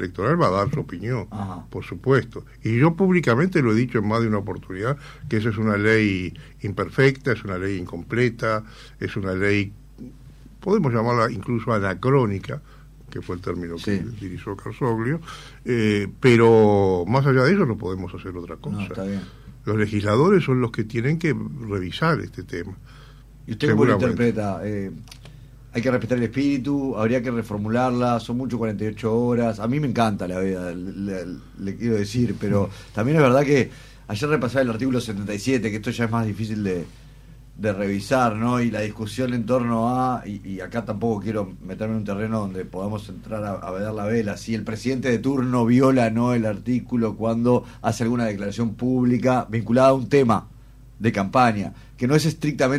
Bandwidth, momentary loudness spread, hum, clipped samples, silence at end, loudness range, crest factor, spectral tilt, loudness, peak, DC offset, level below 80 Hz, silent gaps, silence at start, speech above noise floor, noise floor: 14 kHz; 14 LU; none; under 0.1%; 0 s; 6 LU; 16 dB; -7 dB/octave; -22 LUFS; -6 dBFS; under 0.1%; -46 dBFS; none; 0 s; 23 dB; -45 dBFS